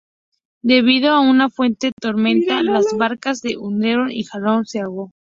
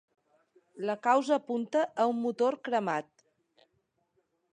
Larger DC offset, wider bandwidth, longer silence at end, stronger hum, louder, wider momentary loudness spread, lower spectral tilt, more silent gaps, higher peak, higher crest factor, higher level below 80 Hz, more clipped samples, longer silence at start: neither; second, 7.6 kHz vs 10 kHz; second, 0.2 s vs 1.55 s; neither; first, -17 LUFS vs -30 LUFS; first, 11 LU vs 8 LU; about the same, -5 dB/octave vs -5 dB/octave; first, 1.92-1.97 s vs none; first, -2 dBFS vs -12 dBFS; about the same, 16 dB vs 20 dB; first, -60 dBFS vs -88 dBFS; neither; about the same, 0.65 s vs 0.75 s